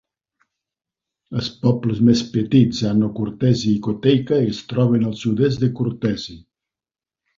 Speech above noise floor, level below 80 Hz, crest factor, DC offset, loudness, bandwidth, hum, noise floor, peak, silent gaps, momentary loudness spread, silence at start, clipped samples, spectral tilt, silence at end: over 72 dB; -50 dBFS; 18 dB; under 0.1%; -19 LUFS; 7.6 kHz; none; under -90 dBFS; -2 dBFS; none; 8 LU; 1.3 s; under 0.1%; -7.5 dB/octave; 1 s